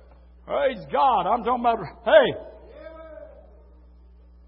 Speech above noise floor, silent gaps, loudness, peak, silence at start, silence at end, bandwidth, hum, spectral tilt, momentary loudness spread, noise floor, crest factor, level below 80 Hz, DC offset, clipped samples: 29 dB; none; -22 LUFS; -2 dBFS; 0.45 s; 1.2 s; 5.6 kHz; none; -9 dB/octave; 26 LU; -50 dBFS; 22 dB; -50 dBFS; under 0.1%; under 0.1%